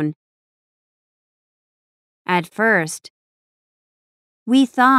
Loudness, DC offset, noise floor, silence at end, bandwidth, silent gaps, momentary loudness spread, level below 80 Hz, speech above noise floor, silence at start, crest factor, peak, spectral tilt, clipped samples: -18 LUFS; under 0.1%; under -90 dBFS; 0 s; 14 kHz; 0.16-2.25 s, 3.10-4.46 s; 16 LU; -78 dBFS; over 74 dB; 0 s; 20 dB; -2 dBFS; -4.5 dB/octave; under 0.1%